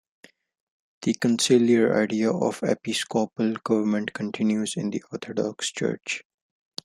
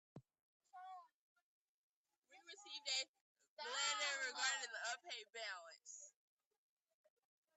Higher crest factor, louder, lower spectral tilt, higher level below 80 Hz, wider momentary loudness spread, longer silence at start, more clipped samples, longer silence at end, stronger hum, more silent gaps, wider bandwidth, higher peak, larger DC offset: about the same, 18 dB vs 22 dB; first, -25 LUFS vs -44 LUFS; first, -4.5 dB/octave vs 1.5 dB/octave; first, -70 dBFS vs under -90 dBFS; second, 11 LU vs 21 LU; first, 1 s vs 0.15 s; neither; second, 0.65 s vs 1.45 s; neither; second, none vs 0.39-0.60 s, 1.14-1.36 s, 1.42-2.05 s, 2.18-2.22 s, 3.08-3.14 s, 3.21-3.35 s, 3.48-3.57 s; first, 13 kHz vs 9 kHz; first, -6 dBFS vs -28 dBFS; neither